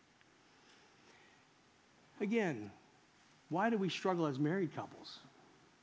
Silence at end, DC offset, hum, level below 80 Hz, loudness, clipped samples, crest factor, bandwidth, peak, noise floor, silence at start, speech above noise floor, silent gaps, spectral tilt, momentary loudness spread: 0.55 s; under 0.1%; none; -84 dBFS; -38 LUFS; under 0.1%; 20 dB; 8 kHz; -20 dBFS; -68 dBFS; 2.15 s; 31 dB; none; -6.5 dB/octave; 17 LU